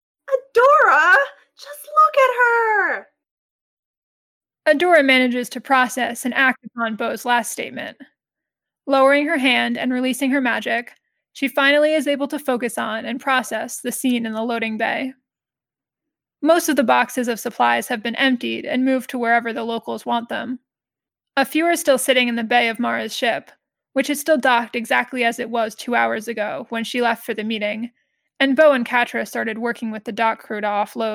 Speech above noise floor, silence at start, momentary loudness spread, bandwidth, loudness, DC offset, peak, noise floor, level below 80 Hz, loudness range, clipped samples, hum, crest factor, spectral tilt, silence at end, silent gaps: over 70 dB; 0.25 s; 11 LU; 17.5 kHz; -19 LUFS; under 0.1%; -4 dBFS; under -90 dBFS; -74 dBFS; 4 LU; under 0.1%; none; 16 dB; -2.5 dB/octave; 0 s; 3.31-4.41 s